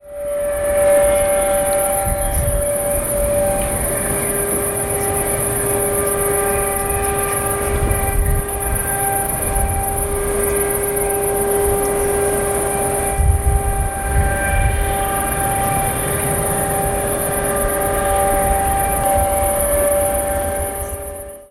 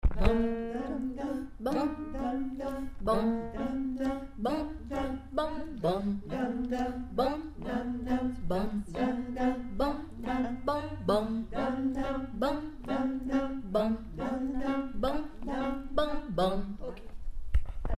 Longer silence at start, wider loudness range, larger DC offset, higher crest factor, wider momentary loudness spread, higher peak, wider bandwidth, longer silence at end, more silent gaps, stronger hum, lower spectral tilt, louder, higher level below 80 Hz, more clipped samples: about the same, 0.05 s vs 0.05 s; about the same, 2 LU vs 1 LU; neither; second, 14 dB vs 22 dB; second, 3 LU vs 6 LU; first, -2 dBFS vs -8 dBFS; first, 16.5 kHz vs 13 kHz; about the same, 0.05 s vs 0.05 s; neither; neither; second, -4 dB/octave vs -7 dB/octave; first, -17 LUFS vs -33 LUFS; first, -26 dBFS vs -40 dBFS; neither